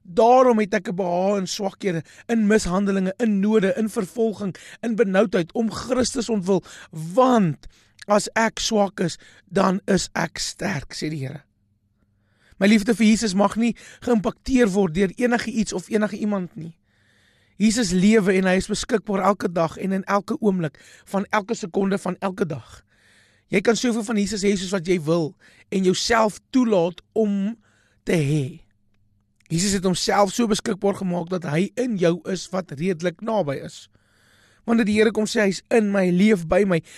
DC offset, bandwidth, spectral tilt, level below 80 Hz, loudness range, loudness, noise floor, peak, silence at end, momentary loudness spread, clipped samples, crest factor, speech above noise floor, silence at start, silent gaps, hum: under 0.1%; 13 kHz; -5 dB/octave; -48 dBFS; 4 LU; -22 LUFS; -66 dBFS; -6 dBFS; 0 s; 10 LU; under 0.1%; 16 dB; 45 dB; 0.1 s; none; none